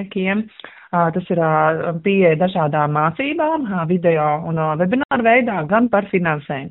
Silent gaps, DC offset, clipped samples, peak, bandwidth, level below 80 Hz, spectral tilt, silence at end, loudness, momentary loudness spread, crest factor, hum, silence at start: 5.05-5.09 s; under 0.1%; under 0.1%; -2 dBFS; 4.1 kHz; -56 dBFS; -5.5 dB/octave; 0 s; -18 LUFS; 6 LU; 16 dB; none; 0 s